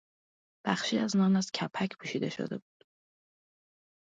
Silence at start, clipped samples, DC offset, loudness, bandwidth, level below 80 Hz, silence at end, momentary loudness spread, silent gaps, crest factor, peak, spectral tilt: 0.65 s; under 0.1%; under 0.1%; -31 LUFS; 9 kHz; -78 dBFS; 1.55 s; 12 LU; none; 20 dB; -14 dBFS; -5 dB/octave